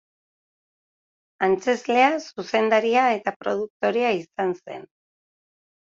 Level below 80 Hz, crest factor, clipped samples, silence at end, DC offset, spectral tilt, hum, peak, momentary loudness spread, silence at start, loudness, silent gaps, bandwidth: -70 dBFS; 20 dB; under 0.1%; 1 s; under 0.1%; -4.5 dB/octave; none; -4 dBFS; 9 LU; 1.4 s; -22 LUFS; 3.36-3.40 s, 3.70-3.80 s; 7.8 kHz